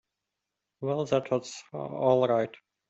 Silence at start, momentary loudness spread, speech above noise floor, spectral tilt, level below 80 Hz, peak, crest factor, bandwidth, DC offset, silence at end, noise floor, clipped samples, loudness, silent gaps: 0.8 s; 13 LU; 58 dB; -6 dB/octave; -70 dBFS; -10 dBFS; 20 dB; 8.2 kHz; under 0.1%; 0.4 s; -86 dBFS; under 0.1%; -29 LUFS; none